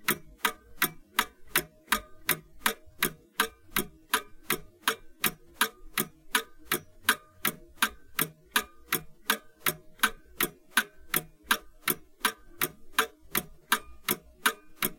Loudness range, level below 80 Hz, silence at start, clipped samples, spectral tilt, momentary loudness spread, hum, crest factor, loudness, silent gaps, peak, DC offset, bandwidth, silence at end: 1 LU; -56 dBFS; 0 s; under 0.1%; -1 dB/octave; 4 LU; none; 26 dB; -31 LUFS; none; -6 dBFS; under 0.1%; 17 kHz; 0 s